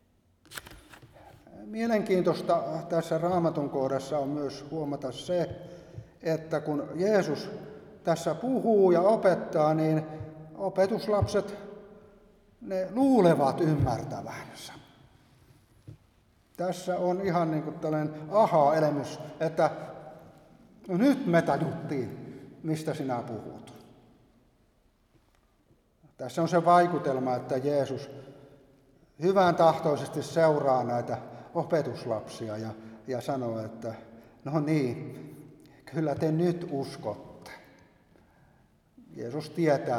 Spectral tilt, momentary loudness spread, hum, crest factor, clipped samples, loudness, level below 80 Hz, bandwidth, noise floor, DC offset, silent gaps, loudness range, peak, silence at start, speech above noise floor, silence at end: -7 dB/octave; 20 LU; none; 20 dB; under 0.1%; -28 LUFS; -60 dBFS; 15.5 kHz; -66 dBFS; under 0.1%; none; 8 LU; -8 dBFS; 0.5 s; 39 dB; 0 s